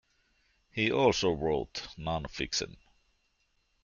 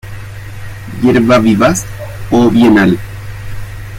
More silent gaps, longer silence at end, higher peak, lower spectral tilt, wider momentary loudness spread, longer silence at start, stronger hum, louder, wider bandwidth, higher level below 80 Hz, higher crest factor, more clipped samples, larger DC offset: neither; first, 1.1 s vs 0 s; second, -12 dBFS vs 0 dBFS; second, -4 dB/octave vs -6 dB/octave; second, 13 LU vs 20 LU; first, 0.75 s vs 0.05 s; neither; second, -31 LUFS vs -10 LUFS; second, 7.4 kHz vs 16 kHz; second, -54 dBFS vs -32 dBFS; first, 22 dB vs 12 dB; neither; neither